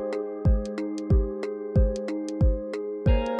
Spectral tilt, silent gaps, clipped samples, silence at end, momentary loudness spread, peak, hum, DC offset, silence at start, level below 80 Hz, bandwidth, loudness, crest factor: -8.5 dB/octave; none; under 0.1%; 0 s; 6 LU; -10 dBFS; none; under 0.1%; 0 s; -28 dBFS; 8.8 kHz; -27 LUFS; 14 dB